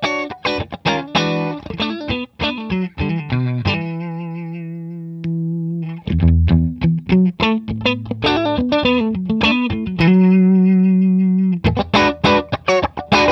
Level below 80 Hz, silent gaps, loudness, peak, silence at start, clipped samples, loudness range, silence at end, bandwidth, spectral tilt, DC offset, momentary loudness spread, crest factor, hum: -32 dBFS; none; -17 LUFS; -2 dBFS; 0 s; under 0.1%; 8 LU; 0 s; 6.6 kHz; -7 dB/octave; under 0.1%; 12 LU; 14 dB; none